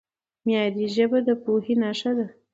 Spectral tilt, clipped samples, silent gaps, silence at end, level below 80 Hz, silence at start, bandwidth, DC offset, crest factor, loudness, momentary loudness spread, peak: -6 dB/octave; under 0.1%; none; 0.2 s; -70 dBFS; 0.45 s; 7.8 kHz; under 0.1%; 16 dB; -24 LUFS; 5 LU; -8 dBFS